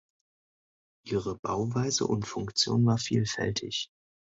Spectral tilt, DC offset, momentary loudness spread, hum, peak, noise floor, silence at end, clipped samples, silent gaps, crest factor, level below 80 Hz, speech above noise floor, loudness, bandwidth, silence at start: -4.5 dB/octave; under 0.1%; 9 LU; none; -12 dBFS; under -90 dBFS; 0.5 s; under 0.1%; 1.39-1.43 s; 18 dB; -58 dBFS; over 61 dB; -29 LUFS; 8 kHz; 1.05 s